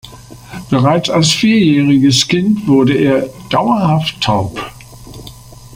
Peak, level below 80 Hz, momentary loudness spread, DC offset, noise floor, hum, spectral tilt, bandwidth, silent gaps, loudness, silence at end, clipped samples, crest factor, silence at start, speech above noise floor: 0 dBFS; -42 dBFS; 19 LU; under 0.1%; -34 dBFS; none; -5 dB/octave; 16 kHz; none; -12 LUFS; 0 s; under 0.1%; 14 dB; 0.05 s; 23 dB